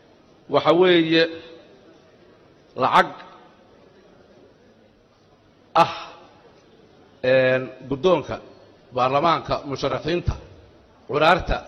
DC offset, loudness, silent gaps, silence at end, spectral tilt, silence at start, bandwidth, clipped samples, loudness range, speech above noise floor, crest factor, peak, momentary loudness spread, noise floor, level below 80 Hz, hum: under 0.1%; -20 LUFS; none; 0.05 s; -6 dB/octave; 0.5 s; 10 kHz; under 0.1%; 7 LU; 36 dB; 18 dB; -4 dBFS; 18 LU; -56 dBFS; -42 dBFS; none